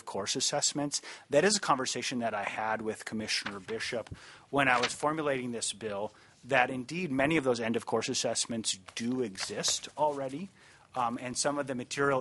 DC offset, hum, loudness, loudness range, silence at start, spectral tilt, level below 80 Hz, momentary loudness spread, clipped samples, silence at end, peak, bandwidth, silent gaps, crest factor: under 0.1%; none; -31 LUFS; 3 LU; 0.05 s; -3 dB/octave; -68 dBFS; 10 LU; under 0.1%; 0 s; -8 dBFS; 11.5 kHz; none; 24 dB